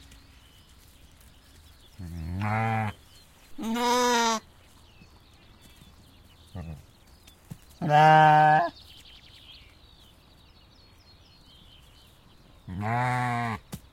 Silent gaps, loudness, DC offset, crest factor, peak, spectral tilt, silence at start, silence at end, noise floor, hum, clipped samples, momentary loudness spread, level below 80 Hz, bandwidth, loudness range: none; -24 LUFS; under 0.1%; 22 dB; -8 dBFS; -4.5 dB/octave; 2 s; 0.15 s; -55 dBFS; none; under 0.1%; 30 LU; -56 dBFS; 16.5 kHz; 11 LU